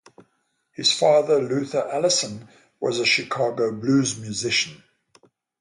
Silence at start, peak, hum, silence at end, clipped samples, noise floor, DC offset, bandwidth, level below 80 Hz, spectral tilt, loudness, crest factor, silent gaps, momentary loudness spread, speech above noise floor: 0.8 s; -6 dBFS; none; 0.85 s; under 0.1%; -71 dBFS; under 0.1%; 11.5 kHz; -66 dBFS; -3 dB/octave; -22 LUFS; 18 dB; none; 11 LU; 49 dB